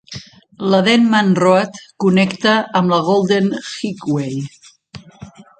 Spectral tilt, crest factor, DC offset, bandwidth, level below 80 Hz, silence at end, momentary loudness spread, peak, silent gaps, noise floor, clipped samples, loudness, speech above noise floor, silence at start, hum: -6 dB/octave; 16 dB; under 0.1%; 9 kHz; -58 dBFS; 0.15 s; 14 LU; 0 dBFS; none; -40 dBFS; under 0.1%; -15 LUFS; 25 dB; 0.1 s; none